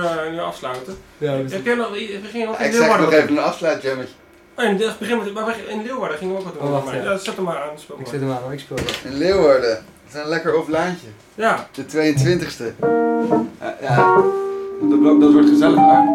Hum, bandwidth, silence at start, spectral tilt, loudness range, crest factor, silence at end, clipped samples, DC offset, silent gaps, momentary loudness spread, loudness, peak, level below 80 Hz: none; 14 kHz; 0 s; -6 dB/octave; 8 LU; 16 dB; 0 s; under 0.1%; under 0.1%; none; 15 LU; -18 LUFS; -2 dBFS; -52 dBFS